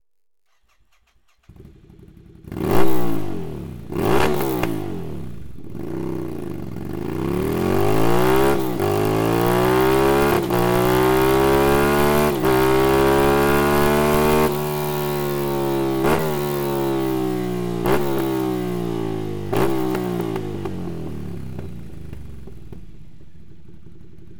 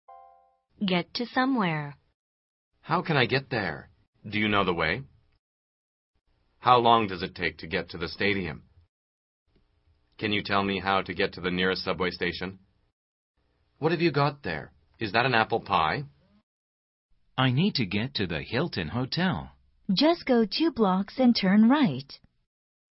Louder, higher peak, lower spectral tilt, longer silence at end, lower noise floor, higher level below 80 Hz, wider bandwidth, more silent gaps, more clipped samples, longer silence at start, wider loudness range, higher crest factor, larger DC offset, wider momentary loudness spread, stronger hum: first, -20 LUFS vs -26 LUFS; first, 0 dBFS vs -6 dBFS; second, -6 dB/octave vs -9 dB/octave; second, 0 s vs 0.75 s; first, -76 dBFS vs -67 dBFS; first, -38 dBFS vs -56 dBFS; first, 19.5 kHz vs 6 kHz; second, none vs 2.14-2.71 s, 4.08-4.13 s, 5.39-6.14 s, 8.89-9.46 s, 12.93-13.34 s, 16.43-17.09 s; neither; first, 1.5 s vs 0.1 s; first, 11 LU vs 6 LU; about the same, 18 dB vs 22 dB; neither; first, 16 LU vs 12 LU; neither